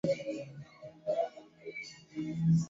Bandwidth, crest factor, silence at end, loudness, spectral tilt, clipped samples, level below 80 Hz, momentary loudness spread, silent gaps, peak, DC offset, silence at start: 7.8 kHz; 16 dB; 0 s; -37 LUFS; -7.5 dB/octave; under 0.1%; -68 dBFS; 16 LU; none; -20 dBFS; under 0.1%; 0.05 s